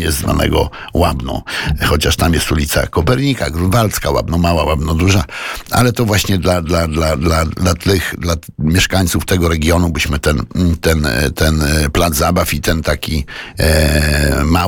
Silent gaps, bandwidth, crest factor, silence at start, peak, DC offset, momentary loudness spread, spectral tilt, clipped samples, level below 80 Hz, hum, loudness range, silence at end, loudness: none; 19 kHz; 12 dB; 0 s; -2 dBFS; under 0.1%; 5 LU; -5 dB/octave; under 0.1%; -22 dBFS; none; 1 LU; 0 s; -14 LUFS